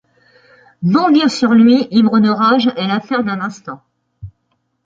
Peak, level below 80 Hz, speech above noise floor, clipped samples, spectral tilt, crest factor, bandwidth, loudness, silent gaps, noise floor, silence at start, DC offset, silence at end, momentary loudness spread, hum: -2 dBFS; -54 dBFS; 54 dB; under 0.1%; -6 dB/octave; 14 dB; 7.8 kHz; -13 LUFS; none; -66 dBFS; 0.8 s; under 0.1%; 0.55 s; 12 LU; none